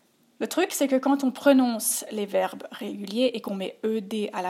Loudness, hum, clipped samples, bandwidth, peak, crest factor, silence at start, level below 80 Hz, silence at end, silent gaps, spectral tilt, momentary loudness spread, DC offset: -25 LUFS; none; under 0.1%; 16 kHz; -6 dBFS; 20 dB; 0.4 s; -80 dBFS; 0 s; none; -3.5 dB/octave; 12 LU; under 0.1%